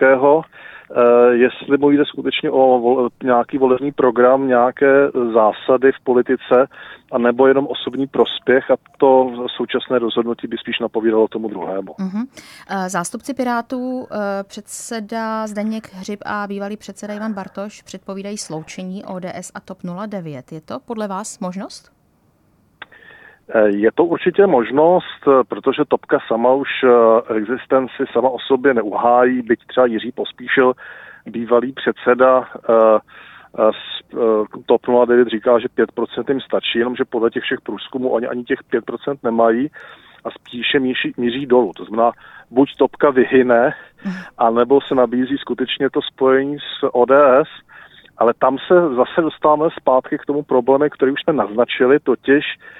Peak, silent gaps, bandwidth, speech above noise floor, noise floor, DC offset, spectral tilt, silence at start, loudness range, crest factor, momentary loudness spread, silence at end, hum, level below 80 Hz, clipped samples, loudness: -2 dBFS; none; 12.5 kHz; 41 dB; -58 dBFS; under 0.1%; -5.5 dB/octave; 0 s; 12 LU; 16 dB; 15 LU; 0.25 s; none; -60 dBFS; under 0.1%; -17 LUFS